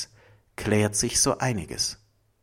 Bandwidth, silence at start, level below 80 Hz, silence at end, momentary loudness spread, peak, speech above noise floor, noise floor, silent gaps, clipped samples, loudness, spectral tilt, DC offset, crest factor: 16.5 kHz; 0 s; -48 dBFS; 0.5 s; 18 LU; -8 dBFS; 32 dB; -57 dBFS; none; under 0.1%; -25 LUFS; -3.5 dB/octave; under 0.1%; 20 dB